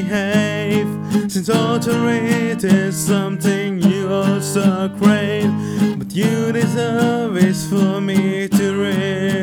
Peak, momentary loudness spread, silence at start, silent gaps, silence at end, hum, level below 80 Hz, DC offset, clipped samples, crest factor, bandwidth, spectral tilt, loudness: 0 dBFS; 3 LU; 0 s; none; 0 s; none; -54 dBFS; under 0.1%; under 0.1%; 16 dB; 17.5 kHz; -6 dB/octave; -17 LUFS